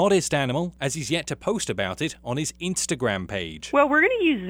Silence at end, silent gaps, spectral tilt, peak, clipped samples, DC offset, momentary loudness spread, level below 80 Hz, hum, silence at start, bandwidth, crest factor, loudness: 0 s; none; -4 dB/octave; -6 dBFS; under 0.1%; under 0.1%; 10 LU; -52 dBFS; none; 0 s; 16.5 kHz; 18 dB; -24 LUFS